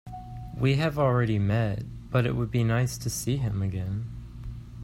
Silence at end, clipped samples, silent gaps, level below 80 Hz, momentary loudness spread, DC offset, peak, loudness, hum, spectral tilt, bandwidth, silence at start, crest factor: 0 s; under 0.1%; none; -44 dBFS; 16 LU; under 0.1%; -10 dBFS; -27 LUFS; none; -6.5 dB/octave; 15 kHz; 0.05 s; 16 dB